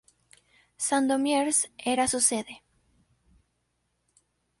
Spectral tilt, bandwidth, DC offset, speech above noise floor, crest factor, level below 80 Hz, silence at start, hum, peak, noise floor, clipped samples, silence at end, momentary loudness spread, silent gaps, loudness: -1.5 dB/octave; 12 kHz; under 0.1%; 50 dB; 22 dB; -64 dBFS; 0.8 s; none; -8 dBFS; -76 dBFS; under 0.1%; 2.05 s; 11 LU; none; -25 LUFS